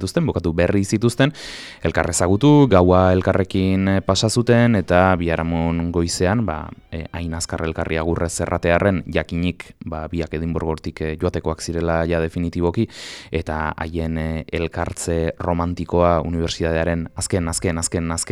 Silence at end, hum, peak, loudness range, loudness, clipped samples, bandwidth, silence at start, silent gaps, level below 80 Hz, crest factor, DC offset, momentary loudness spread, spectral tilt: 0 s; none; -2 dBFS; 7 LU; -20 LUFS; under 0.1%; 13.5 kHz; 0 s; none; -36 dBFS; 18 dB; under 0.1%; 10 LU; -5.5 dB/octave